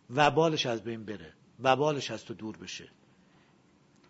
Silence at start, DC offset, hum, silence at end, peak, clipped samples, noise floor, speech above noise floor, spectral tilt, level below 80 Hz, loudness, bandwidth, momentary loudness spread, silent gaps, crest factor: 0.1 s; under 0.1%; none; 1.25 s; -8 dBFS; under 0.1%; -64 dBFS; 34 dB; -4.5 dB/octave; -70 dBFS; -29 LUFS; 8 kHz; 18 LU; none; 24 dB